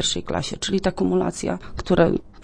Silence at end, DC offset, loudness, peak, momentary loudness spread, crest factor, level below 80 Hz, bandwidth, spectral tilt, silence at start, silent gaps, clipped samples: 0 s; under 0.1%; -23 LUFS; -4 dBFS; 9 LU; 20 dB; -40 dBFS; 10.5 kHz; -4.5 dB/octave; 0 s; none; under 0.1%